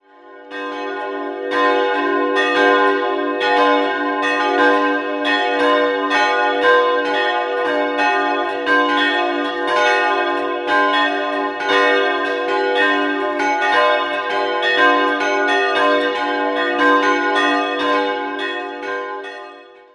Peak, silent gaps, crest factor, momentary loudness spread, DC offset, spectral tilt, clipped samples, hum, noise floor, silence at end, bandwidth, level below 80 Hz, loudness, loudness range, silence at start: -2 dBFS; none; 16 dB; 9 LU; under 0.1%; -2.5 dB/octave; under 0.1%; none; -41 dBFS; 0.3 s; 11 kHz; -66 dBFS; -16 LUFS; 1 LU; 0.25 s